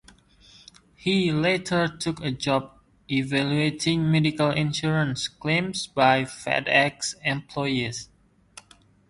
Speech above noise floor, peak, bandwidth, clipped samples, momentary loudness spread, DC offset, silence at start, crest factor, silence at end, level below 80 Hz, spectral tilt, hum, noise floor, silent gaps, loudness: 32 dB; -4 dBFS; 11.5 kHz; under 0.1%; 8 LU; under 0.1%; 1 s; 22 dB; 1.05 s; -56 dBFS; -5 dB/octave; none; -56 dBFS; none; -24 LUFS